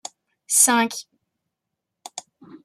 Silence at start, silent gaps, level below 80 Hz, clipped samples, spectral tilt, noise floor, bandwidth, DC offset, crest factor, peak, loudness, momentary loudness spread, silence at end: 0.5 s; none; -80 dBFS; under 0.1%; -0.5 dB/octave; -82 dBFS; 15.5 kHz; under 0.1%; 24 dB; -2 dBFS; -17 LUFS; 23 LU; 0.1 s